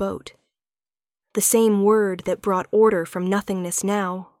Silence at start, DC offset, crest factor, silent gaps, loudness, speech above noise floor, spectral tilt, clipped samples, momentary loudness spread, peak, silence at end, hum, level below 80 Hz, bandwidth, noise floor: 0 s; under 0.1%; 16 dB; none; -21 LUFS; over 69 dB; -4.5 dB/octave; under 0.1%; 11 LU; -6 dBFS; 0.15 s; none; -60 dBFS; 17 kHz; under -90 dBFS